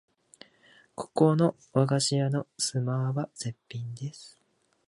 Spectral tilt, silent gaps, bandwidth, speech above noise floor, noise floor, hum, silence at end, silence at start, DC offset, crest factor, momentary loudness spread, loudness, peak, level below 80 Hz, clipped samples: -5.5 dB/octave; none; 11.5 kHz; 33 dB; -60 dBFS; none; 0.6 s; 1 s; under 0.1%; 22 dB; 16 LU; -28 LUFS; -8 dBFS; -72 dBFS; under 0.1%